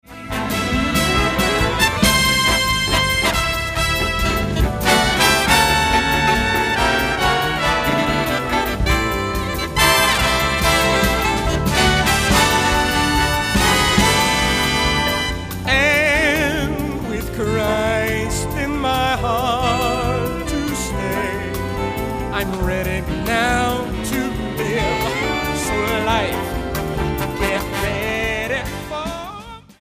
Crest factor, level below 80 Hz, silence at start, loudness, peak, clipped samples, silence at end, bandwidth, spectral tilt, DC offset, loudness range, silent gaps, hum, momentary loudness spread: 18 dB; -28 dBFS; 0.1 s; -17 LUFS; 0 dBFS; under 0.1%; 0.25 s; 15.5 kHz; -3.5 dB/octave; under 0.1%; 6 LU; none; none; 9 LU